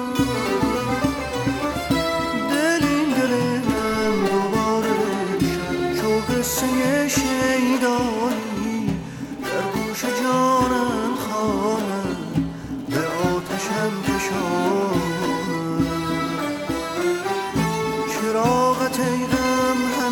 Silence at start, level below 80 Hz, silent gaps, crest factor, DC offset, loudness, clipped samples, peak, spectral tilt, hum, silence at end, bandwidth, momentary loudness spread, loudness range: 0 s; -44 dBFS; none; 16 dB; under 0.1%; -22 LUFS; under 0.1%; -6 dBFS; -4.5 dB/octave; none; 0 s; 19.5 kHz; 6 LU; 3 LU